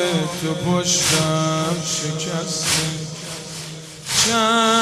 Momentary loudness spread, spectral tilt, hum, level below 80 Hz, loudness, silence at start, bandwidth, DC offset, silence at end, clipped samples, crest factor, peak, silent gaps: 14 LU; -3 dB/octave; none; -52 dBFS; -19 LUFS; 0 s; 16 kHz; under 0.1%; 0 s; under 0.1%; 18 dB; -2 dBFS; none